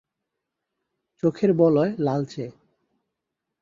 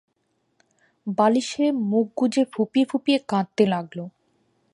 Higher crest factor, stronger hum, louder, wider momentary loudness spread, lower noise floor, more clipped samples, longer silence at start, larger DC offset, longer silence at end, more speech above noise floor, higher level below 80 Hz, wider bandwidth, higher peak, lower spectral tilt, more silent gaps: about the same, 20 dB vs 18 dB; neither; about the same, -22 LUFS vs -22 LUFS; about the same, 15 LU vs 13 LU; first, -83 dBFS vs -71 dBFS; neither; first, 1.25 s vs 1.05 s; neither; first, 1.1 s vs 0.65 s; first, 62 dB vs 50 dB; first, -66 dBFS vs -72 dBFS; second, 7.6 kHz vs 11 kHz; about the same, -6 dBFS vs -6 dBFS; first, -9 dB/octave vs -6 dB/octave; neither